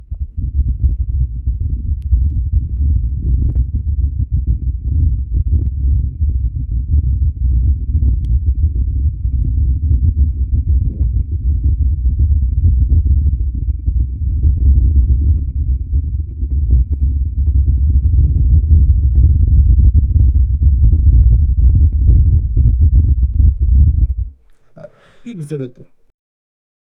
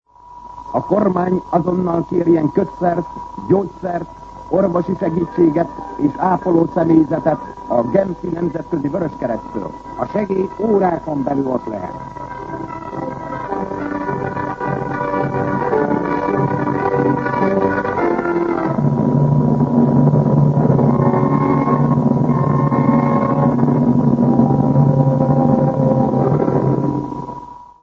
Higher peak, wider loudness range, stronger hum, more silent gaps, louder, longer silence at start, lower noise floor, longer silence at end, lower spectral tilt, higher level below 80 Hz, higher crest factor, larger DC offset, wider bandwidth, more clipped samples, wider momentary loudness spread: about the same, 0 dBFS vs 0 dBFS; about the same, 6 LU vs 7 LU; neither; neither; about the same, -15 LUFS vs -17 LUFS; second, 0 s vs 0.3 s; first, -42 dBFS vs -38 dBFS; first, 1.15 s vs 0.15 s; first, -12 dB/octave vs -10.5 dB/octave; first, -14 dBFS vs -44 dBFS; about the same, 12 dB vs 16 dB; neither; second, 0.7 kHz vs 6.8 kHz; neither; second, 8 LU vs 12 LU